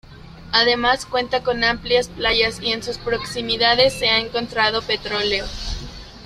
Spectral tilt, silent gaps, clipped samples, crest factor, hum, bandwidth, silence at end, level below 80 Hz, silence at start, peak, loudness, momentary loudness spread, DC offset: -3 dB/octave; none; under 0.1%; 20 dB; none; 14 kHz; 0 s; -38 dBFS; 0.05 s; -2 dBFS; -19 LUFS; 9 LU; under 0.1%